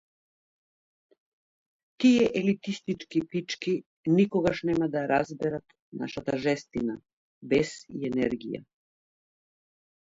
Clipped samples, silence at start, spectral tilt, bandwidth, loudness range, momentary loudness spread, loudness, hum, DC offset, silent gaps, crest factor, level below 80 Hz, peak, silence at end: under 0.1%; 2 s; -6 dB/octave; 7.8 kHz; 5 LU; 13 LU; -28 LUFS; none; under 0.1%; 3.86-4.04 s, 5.80-5.92 s, 7.13-7.41 s; 18 dB; -60 dBFS; -10 dBFS; 1.45 s